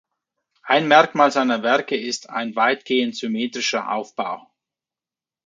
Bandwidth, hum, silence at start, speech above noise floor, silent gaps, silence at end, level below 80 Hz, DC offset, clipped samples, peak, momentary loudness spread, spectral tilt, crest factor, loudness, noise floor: 9.4 kHz; none; 0.65 s; over 70 dB; none; 1.1 s; -76 dBFS; under 0.1%; under 0.1%; 0 dBFS; 12 LU; -3.5 dB/octave; 22 dB; -20 LUFS; under -90 dBFS